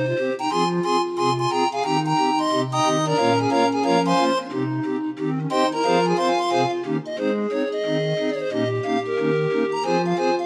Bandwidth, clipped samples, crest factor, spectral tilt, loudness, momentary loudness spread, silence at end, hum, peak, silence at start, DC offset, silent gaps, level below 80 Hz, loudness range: 12.5 kHz; under 0.1%; 14 dB; -5.5 dB/octave; -22 LUFS; 5 LU; 0 s; none; -6 dBFS; 0 s; under 0.1%; none; -72 dBFS; 3 LU